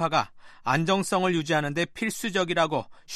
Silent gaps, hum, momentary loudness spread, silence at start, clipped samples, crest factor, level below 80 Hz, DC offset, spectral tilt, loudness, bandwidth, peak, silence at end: none; none; 6 LU; 0 s; under 0.1%; 18 dB; -60 dBFS; under 0.1%; -4.5 dB/octave; -26 LUFS; 13.5 kHz; -8 dBFS; 0 s